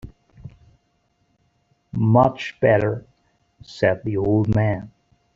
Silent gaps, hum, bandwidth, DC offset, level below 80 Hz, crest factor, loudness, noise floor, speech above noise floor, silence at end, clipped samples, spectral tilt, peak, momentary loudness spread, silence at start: none; none; 7.2 kHz; under 0.1%; -48 dBFS; 20 dB; -20 LUFS; -67 dBFS; 48 dB; 0.45 s; under 0.1%; -8.5 dB/octave; -2 dBFS; 14 LU; 0.05 s